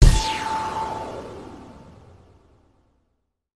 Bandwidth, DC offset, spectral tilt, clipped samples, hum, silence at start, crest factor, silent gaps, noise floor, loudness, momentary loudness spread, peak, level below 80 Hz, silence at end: 13 kHz; under 0.1%; -4.5 dB/octave; under 0.1%; none; 0 s; 22 dB; none; -73 dBFS; -26 LUFS; 23 LU; 0 dBFS; -26 dBFS; 1.8 s